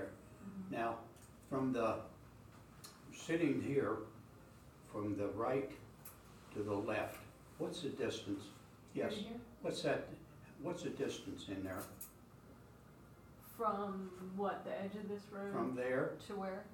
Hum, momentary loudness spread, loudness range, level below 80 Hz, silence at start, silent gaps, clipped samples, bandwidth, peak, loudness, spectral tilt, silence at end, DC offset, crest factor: none; 21 LU; 4 LU; -70 dBFS; 0 s; none; under 0.1%; 19 kHz; -24 dBFS; -42 LUFS; -5.5 dB/octave; 0 s; under 0.1%; 20 dB